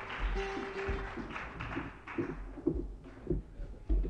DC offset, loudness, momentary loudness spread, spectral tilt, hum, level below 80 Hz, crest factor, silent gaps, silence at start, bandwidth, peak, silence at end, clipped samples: under 0.1%; -40 LUFS; 7 LU; -7 dB/octave; none; -40 dBFS; 20 dB; none; 0 s; 7.6 kHz; -18 dBFS; 0 s; under 0.1%